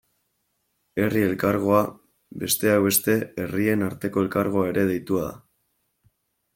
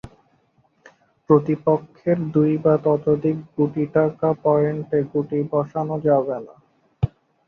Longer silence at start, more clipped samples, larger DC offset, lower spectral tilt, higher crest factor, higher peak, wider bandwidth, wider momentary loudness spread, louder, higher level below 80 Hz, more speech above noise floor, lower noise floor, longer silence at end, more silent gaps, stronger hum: first, 0.95 s vs 0.05 s; neither; neither; second, -5 dB/octave vs -11.5 dB/octave; about the same, 20 dB vs 18 dB; about the same, -4 dBFS vs -4 dBFS; first, 17 kHz vs 4.1 kHz; about the same, 10 LU vs 8 LU; about the same, -23 LUFS vs -21 LUFS; second, -58 dBFS vs -50 dBFS; first, 51 dB vs 42 dB; first, -73 dBFS vs -62 dBFS; first, 1.2 s vs 0.4 s; neither; neither